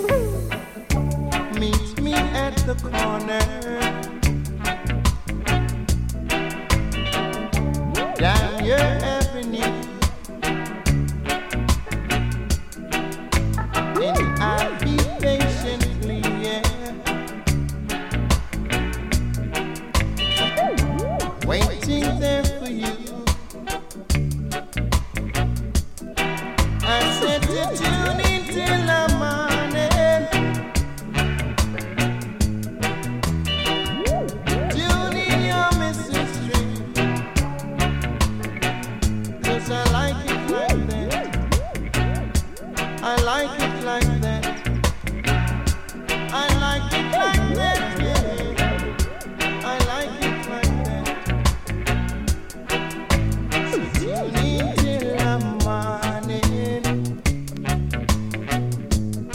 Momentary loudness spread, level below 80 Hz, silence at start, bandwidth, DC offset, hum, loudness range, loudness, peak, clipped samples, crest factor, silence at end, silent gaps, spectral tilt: 6 LU; -28 dBFS; 0 s; 17 kHz; under 0.1%; none; 3 LU; -23 LUFS; -2 dBFS; under 0.1%; 20 dB; 0 s; none; -5 dB/octave